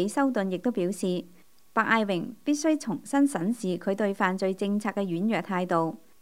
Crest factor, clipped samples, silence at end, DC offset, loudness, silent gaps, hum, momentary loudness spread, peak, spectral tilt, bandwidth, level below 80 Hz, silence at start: 20 dB; under 0.1%; 0.25 s; 0.2%; -27 LUFS; none; none; 5 LU; -8 dBFS; -5.5 dB/octave; 16 kHz; -74 dBFS; 0 s